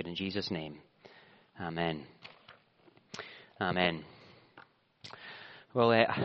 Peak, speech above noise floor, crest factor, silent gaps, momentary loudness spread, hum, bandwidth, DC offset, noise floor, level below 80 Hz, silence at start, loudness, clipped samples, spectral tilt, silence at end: -8 dBFS; 33 dB; 28 dB; none; 25 LU; none; 6.6 kHz; under 0.1%; -65 dBFS; -72 dBFS; 0 s; -33 LUFS; under 0.1%; -3.5 dB/octave; 0 s